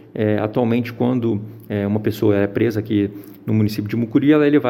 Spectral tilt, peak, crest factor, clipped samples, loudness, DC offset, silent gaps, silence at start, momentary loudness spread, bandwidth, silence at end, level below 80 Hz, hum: -8.5 dB/octave; -4 dBFS; 14 dB; under 0.1%; -19 LUFS; under 0.1%; none; 0.15 s; 8 LU; 16.5 kHz; 0 s; -56 dBFS; none